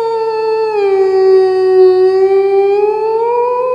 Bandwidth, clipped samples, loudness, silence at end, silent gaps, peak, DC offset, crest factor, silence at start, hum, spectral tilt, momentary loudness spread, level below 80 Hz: 5.2 kHz; under 0.1%; -11 LUFS; 0 s; none; 0 dBFS; under 0.1%; 10 dB; 0 s; 60 Hz at -60 dBFS; -6 dB/octave; 6 LU; -64 dBFS